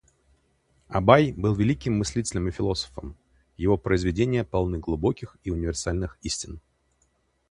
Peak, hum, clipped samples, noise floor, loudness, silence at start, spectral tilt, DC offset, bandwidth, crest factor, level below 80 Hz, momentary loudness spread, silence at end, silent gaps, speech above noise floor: 0 dBFS; none; under 0.1%; -69 dBFS; -25 LUFS; 0.9 s; -6 dB/octave; under 0.1%; 11.5 kHz; 26 dB; -40 dBFS; 14 LU; 0.95 s; none; 44 dB